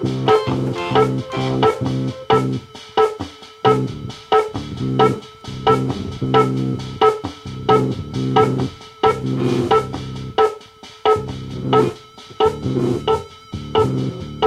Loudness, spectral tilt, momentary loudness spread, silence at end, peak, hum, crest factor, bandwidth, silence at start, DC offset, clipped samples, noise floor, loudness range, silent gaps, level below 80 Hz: -19 LUFS; -7 dB/octave; 12 LU; 0 s; 0 dBFS; none; 18 dB; 12 kHz; 0 s; under 0.1%; under 0.1%; -40 dBFS; 2 LU; none; -44 dBFS